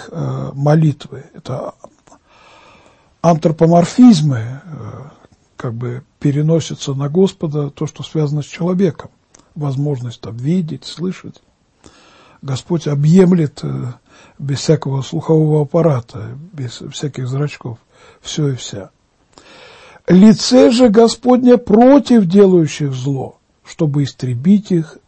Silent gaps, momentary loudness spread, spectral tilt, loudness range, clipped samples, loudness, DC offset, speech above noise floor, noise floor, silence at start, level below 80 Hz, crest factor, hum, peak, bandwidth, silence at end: none; 20 LU; -7 dB/octave; 12 LU; under 0.1%; -14 LUFS; under 0.1%; 35 dB; -49 dBFS; 0 s; -50 dBFS; 14 dB; none; 0 dBFS; 8.8 kHz; 0.2 s